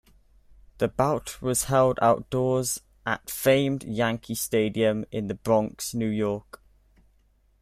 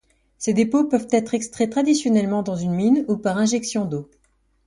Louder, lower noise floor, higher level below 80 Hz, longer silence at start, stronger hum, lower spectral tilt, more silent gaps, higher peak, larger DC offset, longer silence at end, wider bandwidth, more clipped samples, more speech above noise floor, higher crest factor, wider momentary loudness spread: second, -26 LUFS vs -21 LUFS; about the same, -63 dBFS vs -64 dBFS; about the same, -54 dBFS vs -58 dBFS; first, 0.8 s vs 0.4 s; neither; about the same, -5 dB/octave vs -5.5 dB/octave; neither; about the same, -8 dBFS vs -6 dBFS; neither; first, 1.2 s vs 0.65 s; first, 16 kHz vs 11.5 kHz; neither; second, 38 dB vs 44 dB; about the same, 18 dB vs 16 dB; about the same, 9 LU vs 7 LU